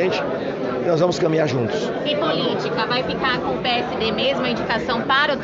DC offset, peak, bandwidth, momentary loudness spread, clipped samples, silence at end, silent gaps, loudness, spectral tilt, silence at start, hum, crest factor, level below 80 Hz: under 0.1%; -4 dBFS; 7.8 kHz; 5 LU; under 0.1%; 0 s; none; -21 LUFS; -3 dB/octave; 0 s; none; 16 dB; -50 dBFS